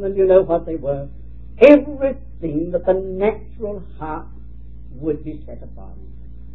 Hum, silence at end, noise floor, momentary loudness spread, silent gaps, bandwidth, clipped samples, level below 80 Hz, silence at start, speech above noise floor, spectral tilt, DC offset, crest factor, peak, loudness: none; 0 s; -38 dBFS; 24 LU; none; 5.8 kHz; under 0.1%; -38 dBFS; 0 s; 19 dB; -9 dB/octave; 2%; 20 dB; 0 dBFS; -18 LUFS